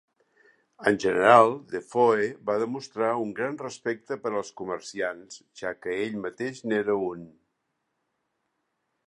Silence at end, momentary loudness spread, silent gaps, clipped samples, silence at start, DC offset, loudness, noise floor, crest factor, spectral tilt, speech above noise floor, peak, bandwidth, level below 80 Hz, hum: 1.8 s; 15 LU; none; under 0.1%; 0.8 s; under 0.1%; -26 LUFS; -78 dBFS; 24 dB; -5 dB/octave; 52 dB; -2 dBFS; 11.5 kHz; -70 dBFS; none